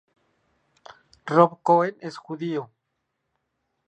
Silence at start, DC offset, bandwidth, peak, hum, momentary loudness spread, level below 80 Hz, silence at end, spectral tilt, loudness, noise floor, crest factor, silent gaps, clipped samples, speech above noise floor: 1.25 s; under 0.1%; 8.6 kHz; -2 dBFS; none; 17 LU; -76 dBFS; 1.25 s; -7.5 dB/octave; -22 LUFS; -78 dBFS; 24 dB; none; under 0.1%; 56 dB